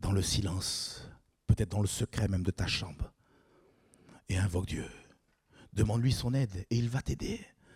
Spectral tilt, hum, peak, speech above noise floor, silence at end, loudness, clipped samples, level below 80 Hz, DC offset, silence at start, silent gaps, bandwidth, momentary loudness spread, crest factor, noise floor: -5 dB/octave; none; -14 dBFS; 34 dB; 0.3 s; -33 LUFS; under 0.1%; -46 dBFS; under 0.1%; 0 s; none; 15.5 kHz; 13 LU; 20 dB; -66 dBFS